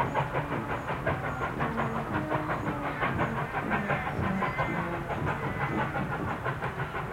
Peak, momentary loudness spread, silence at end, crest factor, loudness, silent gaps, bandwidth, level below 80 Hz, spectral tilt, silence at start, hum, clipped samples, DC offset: -14 dBFS; 3 LU; 0 s; 16 dB; -31 LUFS; none; 16.5 kHz; -48 dBFS; -7 dB/octave; 0 s; none; under 0.1%; under 0.1%